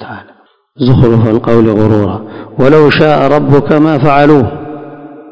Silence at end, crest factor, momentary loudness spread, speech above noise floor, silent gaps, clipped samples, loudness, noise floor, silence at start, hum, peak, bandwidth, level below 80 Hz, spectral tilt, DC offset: 0 s; 8 dB; 18 LU; 37 dB; none; 5%; -8 LUFS; -45 dBFS; 0 s; none; 0 dBFS; 8 kHz; -34 dBFS; -9 dB/octave; under 0.1%